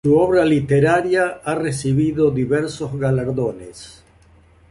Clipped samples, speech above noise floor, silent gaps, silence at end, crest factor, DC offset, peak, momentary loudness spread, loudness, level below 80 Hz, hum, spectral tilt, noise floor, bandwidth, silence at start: under 0.1%; 33 dB; none; 0.8 s; 14 dB; under 0.1%; -4 dBFS; 10 LU; -18 LUFS; -46 dBFS; none; -7 dB/octave; -51 dBFS; 11.5 kHz; 0.05 s